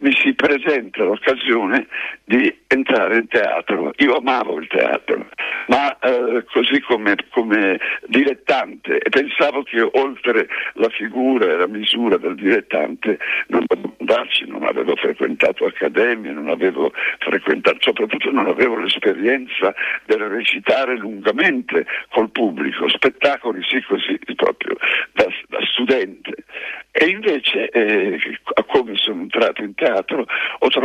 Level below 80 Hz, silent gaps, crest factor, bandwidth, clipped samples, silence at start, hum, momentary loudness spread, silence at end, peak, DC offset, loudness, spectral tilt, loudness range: -62 dBFS; none; 16 dB; 10 kHz; under 0.1%; 0 s; none; 5 LU; 0 s; -2 dBFS; under 0.1%; -18 LUFS; -5 dB/octave; 1 LU